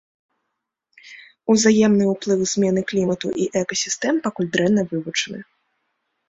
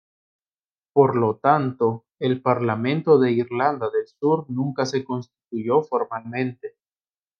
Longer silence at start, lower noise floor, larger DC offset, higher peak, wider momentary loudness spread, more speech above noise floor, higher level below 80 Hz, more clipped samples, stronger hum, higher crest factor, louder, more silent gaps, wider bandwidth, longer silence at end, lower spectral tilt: about the same, 1.05 s vs 0.95 s; second, -79 dBFS vs under -90 dBFS; neither; about the same, -4 dBFS vs -2 dBFS; about the same, 9 LU vs 11 LU; second, 60 dB vs over 69 dB; first, -60 dBFS vs -72 dBFS; neither; neither; about the same, 18 dB vs 20 dB; about the same, -20 LUFS vs -22 LUFS; neither; first, 8 kHz vs 7 kHz; first, 0.85 s vs 0.7 s; second, -4.5 dB/octave vs -7.5 dB/octave